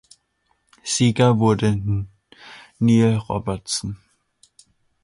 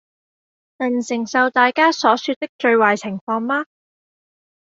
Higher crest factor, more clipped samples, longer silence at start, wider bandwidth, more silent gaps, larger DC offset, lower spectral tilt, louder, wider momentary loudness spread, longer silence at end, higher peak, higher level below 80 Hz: about the same, 16 dB vs 18 dB; neither; about the same, 0.85 s vs 0.8 s; first, 11.5 kHz vs 7.8 kHz; second, none vs 2.36-2.41 s, 2.49-2.59 s, 3.21-3.27 s; neither; first, -5.5 dB/octave vs -4 dB/octave; about the same, -20 LUFS vs -18 LUFS; first, 21 LU vs 9 LU; about the same, 1.1 s vs 1.05 s; second, -6 dBFS vs -2 dBFS; first, -46 dBFS vs -70 dBFS